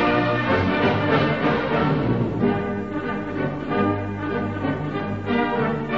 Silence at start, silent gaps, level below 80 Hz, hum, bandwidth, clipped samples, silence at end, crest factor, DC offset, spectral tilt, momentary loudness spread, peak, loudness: 0 s; none; -46 dBFS; none; 7.4 kHz; under 0.1%; 0 s; 16 dB; 0.5%; -8 dB/octave; 7 LU; -6 dBFS; -22 LUFS